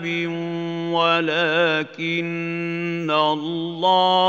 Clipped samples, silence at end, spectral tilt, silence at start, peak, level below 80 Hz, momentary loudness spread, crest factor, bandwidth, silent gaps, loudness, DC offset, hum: under 0.1%; 0 s; -6 dB/octave; 0 s; -6 dBFS; -76 dBFS; 8 LU; 16 dB; 7.6 kHz; none; -21 LUFS; under 0.1%; none